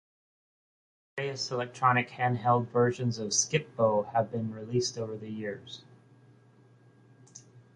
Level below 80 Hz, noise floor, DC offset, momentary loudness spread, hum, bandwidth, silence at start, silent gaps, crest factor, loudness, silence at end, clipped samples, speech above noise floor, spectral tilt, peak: -70 dBFS; -59 dBFS; under 0.1%; 12 LU; none; 11 kHz; 1.15 s; none; 22 dB; -29 LUFS; 0.15 s; under 0.1%; 30 dB; -4 dB/octave; -10 dBFS